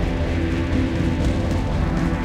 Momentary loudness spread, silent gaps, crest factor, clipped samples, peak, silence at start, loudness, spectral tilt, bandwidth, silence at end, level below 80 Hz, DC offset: 1 LU; none; 12 dB; under 0.1%; -8 dBFS; 0 s; -22 LUFS; -7.5 dB/octave; 11 kHz; 0 s; -26 dBFS; under 0.1%